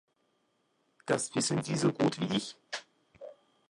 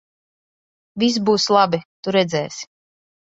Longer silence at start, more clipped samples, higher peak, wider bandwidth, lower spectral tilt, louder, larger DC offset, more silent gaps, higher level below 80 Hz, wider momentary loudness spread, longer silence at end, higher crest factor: about the same, 1.05 s vs 0.95 s; neither; second, -12 dBFS vs -2 dBFS; first, 11.5 kHz vs 8 kHz; about the same, -4.5 dB/octave vs -4.5 dB/octave; second, -32 LUFS vs -19 LUFS; neither; second, none vs 1.85-2.03 s; second, -72 dBFS vs -64 dBFS; first, 22 LU vs 18 LU; second, 0.35 s vs 0.7 s; about the same, 22 dB vs 20 dB